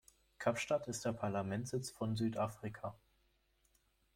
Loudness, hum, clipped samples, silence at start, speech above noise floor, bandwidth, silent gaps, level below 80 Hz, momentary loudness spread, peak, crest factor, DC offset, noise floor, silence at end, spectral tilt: -40 LUFS; none; under 0.1%; 0.4 s; 37 dB; 16.5 kHz; none; -72 dBFS; 8 LU; -20 dBFS; 20 dB; under 0.1%; -76 dBFS; 1.2 s; -5.5 dB/octave